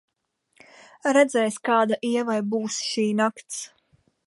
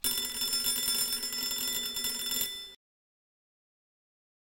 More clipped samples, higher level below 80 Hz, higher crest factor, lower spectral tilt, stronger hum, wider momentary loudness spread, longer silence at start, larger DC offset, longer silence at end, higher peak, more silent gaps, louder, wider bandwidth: neither; second, -78 dBFS vs -62 dBFS; about the same, 18 dB vs 20 dB; first, -4 dB/octave vs 1 dB/octave; neither; first, 14 LU vs 5 LU; first, 1.05 s vs 0.05 s; neither; second, 0.6 s vs 1.8 s; first, -6 dBFS vs -16 dBFS; neither; first, -24 LUFS vs -29 LUFS; second, 11.5 kHz vs 17.5 kHz